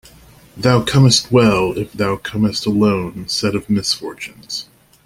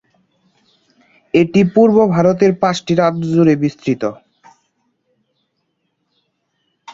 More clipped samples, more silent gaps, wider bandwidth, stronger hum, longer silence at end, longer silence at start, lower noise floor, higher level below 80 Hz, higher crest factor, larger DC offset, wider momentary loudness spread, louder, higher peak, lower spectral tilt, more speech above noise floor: neither; neither; first, 16 kHz vs 7.8 kHz; neither; first, 0.4 s vs 0 s; second, 0.55 s vs 1.35 s; second, -45 dBFS vs -69 dBFS; first, -46 dBFS vs -54 dBFS; about the same, 16 dB vs 16 dB; neither; first, 15 LU vs 9 LU; about the same, -16 LUFS vs -14 LUFS; about the same, 0 dBFS vs -2 dBFS; second, -5 dB/octave vs -7.5 dB/octave; second, 29 dB vs 56 dB